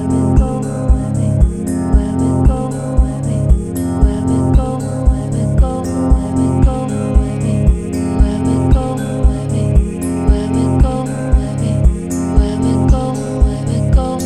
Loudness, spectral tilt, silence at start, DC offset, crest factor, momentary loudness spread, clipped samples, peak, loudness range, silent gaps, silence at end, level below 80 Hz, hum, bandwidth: -15 LUFS; -8 dB/octave; 0 s; under 0.1%; 12 dB; 4 LU; under 0.1%; 0 dBFS; 1 LU; none; 0 s; -16 dBFS; none; 12.5 kHz